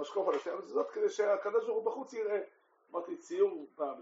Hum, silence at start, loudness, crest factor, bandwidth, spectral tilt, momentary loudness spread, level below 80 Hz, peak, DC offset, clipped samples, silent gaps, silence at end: none; 0 s; -35 LUFS; 16 dB; 7.6 kHz; -2.5 dB/octave; 9 LU; under -90 dBFS; -18 dBFS; under 0.1%; under 0.1%; none; 0 s